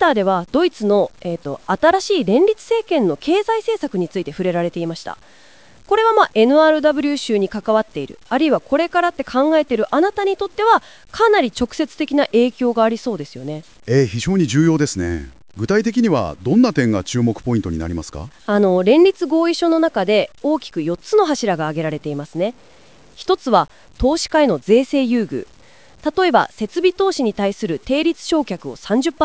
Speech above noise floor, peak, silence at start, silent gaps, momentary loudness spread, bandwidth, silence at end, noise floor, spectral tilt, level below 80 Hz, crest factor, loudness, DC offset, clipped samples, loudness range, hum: 30 dB; 0 dBFS; 0 s; none; 12 LU; 8 kHz; 0 s; -47 dBFS; -5.5 dB/octave; -42 dBFS; 16 dB; -17 LUFS; 0.4%; under 0.1%; 3 LU; none